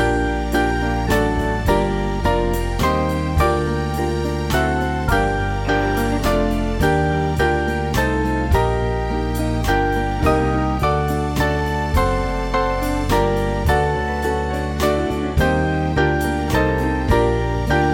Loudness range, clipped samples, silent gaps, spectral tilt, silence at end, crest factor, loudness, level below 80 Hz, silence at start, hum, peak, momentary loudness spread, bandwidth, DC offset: 1 LU; under 0.1%; none; -6.5 dB/octave; 0 s; 16 dB; -19 LUFS; -26 dBFS; 0 s; none; -4 dBFS; 3 LU; 17 kHz; under 0.1%